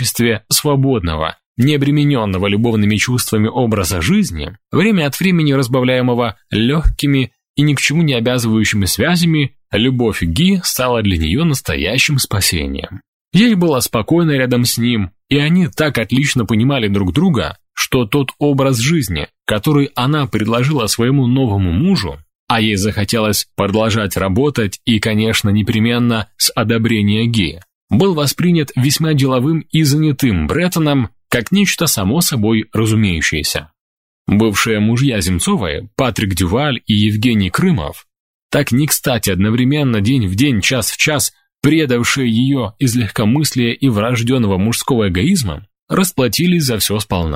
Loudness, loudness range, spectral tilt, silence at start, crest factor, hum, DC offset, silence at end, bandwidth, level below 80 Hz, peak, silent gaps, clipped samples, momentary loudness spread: -14 LUFS; 1 LU; -5 dB/octave; 0 s; 14 dB; none; 0.1%; 0 s; 16.5 kHz; -34 dBFS; 0 dBFS; 1.46-1.55 s, 7.49-7.54 s, 13.08-13.25 s, 22.35-22.47 s, 27.75-27.88 s, 33.80-34.25 s, 38.20-38.50 s, 45.82-45.87 s; under 0.1%; 5 LU